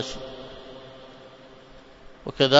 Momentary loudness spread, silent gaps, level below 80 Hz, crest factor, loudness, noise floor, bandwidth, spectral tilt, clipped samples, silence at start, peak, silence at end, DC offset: 15 LU; none; -52 dBFS; 26 dB; -34 LUFS; -48 dBFS; 7.8 kHz; -4.5 dB/octave; under 0.1%; 0 s; 0 dBFS; 0 s; under 0.1%